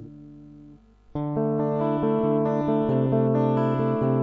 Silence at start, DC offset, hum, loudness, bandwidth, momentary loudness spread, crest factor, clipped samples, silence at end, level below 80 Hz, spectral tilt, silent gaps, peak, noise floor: 0 s; under 0.1%; 50 Hz at -50 dBFS; -24 LUFS; 4.4 kHz; 7 LU; 14 dB; under 0.1%; 0 s; -54 dBFS; -11 dB/octave; none; -10 dBFS; -50 dBFS